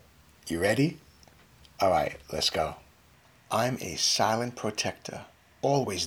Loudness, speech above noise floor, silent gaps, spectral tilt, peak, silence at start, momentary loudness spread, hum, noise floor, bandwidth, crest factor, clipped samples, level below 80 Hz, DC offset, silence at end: -28 LUFS; 31 dB; none; -3.5 dB/octave; -12 dBFS; 0.45 s; 16 LU; none; -59 dBFS; over 20 kHz; 18 dB; under 0.1%; -60 dBFS; under 0.1%; 0 s